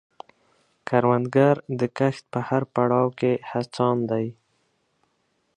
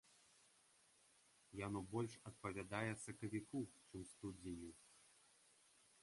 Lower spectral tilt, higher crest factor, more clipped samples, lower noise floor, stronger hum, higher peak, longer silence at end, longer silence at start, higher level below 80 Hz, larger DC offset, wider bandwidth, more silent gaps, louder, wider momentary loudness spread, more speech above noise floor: first, -8 dB/octave vs -5.5 dB/octave; about the same, 20 dB vs 24 dB; neither; second, -71 dBFS vs -75 dBFS; neither; first, -4 dBFS vs -28 dBFS; first, 1.25 s vs 0.85 s; first, 0.85 s vs 0.05 s; first, -66 dBFS vs -74 dBFS; neither; second, 10 kHz vs 11.5 kHz; neither; first, -23 LUFS vs -50 LUFS; second, 9 LU vs 19 LU; first, 48 dB vs 26 dB